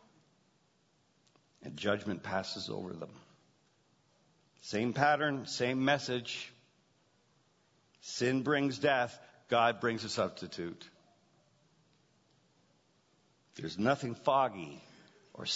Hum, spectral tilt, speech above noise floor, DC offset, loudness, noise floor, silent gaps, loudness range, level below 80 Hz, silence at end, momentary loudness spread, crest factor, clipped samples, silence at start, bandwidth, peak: none; -3 dB/octave; 39 dB; under 0.1%; -33 LUFS; -72 dBFS; none; 8 LU; -76 dBFS; 0 s; 19 LU; 26 dB; under 0.1%; 1.6 s; 7.6 kHz; -12 dBFS